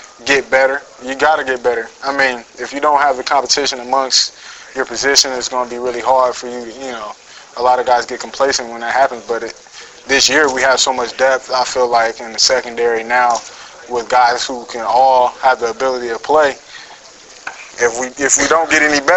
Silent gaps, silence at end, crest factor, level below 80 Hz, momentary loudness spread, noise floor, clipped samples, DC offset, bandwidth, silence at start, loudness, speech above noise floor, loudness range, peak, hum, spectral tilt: none; 0 s; 16 dB; -50 dBFS; 16 LU; -39 dBFS; under 0.1%; under 0.1%; 13 kHz; 0 s; -14 LUFS; 24 dB; 3 LU; 0 dBFS; none; -0.5 dB/octave